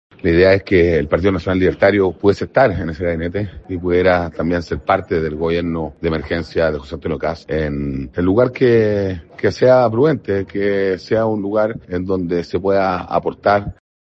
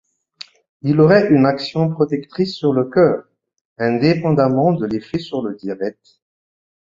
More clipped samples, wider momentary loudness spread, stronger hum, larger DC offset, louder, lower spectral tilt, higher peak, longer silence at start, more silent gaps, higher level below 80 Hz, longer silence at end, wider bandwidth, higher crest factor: neither; second, 9 LU vs 14 LU; neither; neither; about the same, -17 LUFS vs -17 LUFS; about the same, -8 dB/octave vs -8.5 dB/octave; about the same, 0 dBFS vs -2 dBFS; second, 0.25 s vs 0.85 s; second, none vs 3.61-3.76 s; first, -40 dBFS vs -56 dBFS; second, 0.35 s vs 0.95 s; about the same, 7.6 kHz vs 7.6 kHz; about the same, 16 dB vs 16 dB